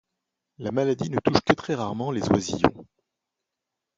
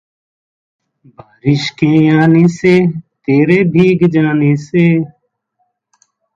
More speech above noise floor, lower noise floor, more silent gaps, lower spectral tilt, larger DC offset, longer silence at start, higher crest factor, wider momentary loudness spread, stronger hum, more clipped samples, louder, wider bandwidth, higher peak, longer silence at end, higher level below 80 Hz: first, 61 dB vs 55 dB; first, -85 dBFS vs -66 dBFS; neither; second, -5.5 dB/octave vs -8 dB/octave; neither; second, 0.6 s vs 1.45 s; first, 24 dB vs 12 dB; about the same, 7 LU vs 8 LU; neither; neither; second, -25 LUFS vs -11 LUFS; first, 9.2 kHz vs 7.6 kHz; about the same, -2 dBFS vs 0 dBFS; second, 1.15 s vs 1.3 s; about the same, -50 dBFS vs -52 dBFS